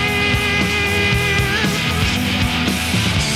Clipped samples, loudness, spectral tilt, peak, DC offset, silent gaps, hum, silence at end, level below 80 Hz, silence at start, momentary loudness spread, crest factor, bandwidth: under 0.1%; -16 LUFS; -4 dB/octave; -4 dBFS; under 0.1%; none; none; 0 s; -30 dBFS; 0 s; 2 LU; 14 dB; 16.5 kHz